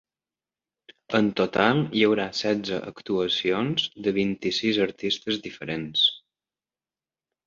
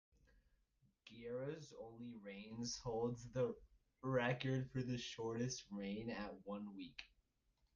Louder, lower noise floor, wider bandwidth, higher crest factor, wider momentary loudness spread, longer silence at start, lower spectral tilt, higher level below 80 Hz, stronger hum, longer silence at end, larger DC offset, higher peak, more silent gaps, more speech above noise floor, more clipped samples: first, -24 LUFS vs -46 LUFS; first, under -90 dBFS vs -82 dBFS; second, 7.6 kHz vs 9.6 kHz; about the same, 22 dB vs 20 dB; second, 9 LU vs 14 LU; about the same, 1.1 s vs 1.05 s; about the same, -5 dB/octave vs -5.5 dB/octave; first, -62 dBFS vs -72 dBFS; neither; first, 1.3 s vs 0.7 s; neither; first, -4 dBFS vs -28 dBFS; neither; first, over 65 dB vs 37 dB; neither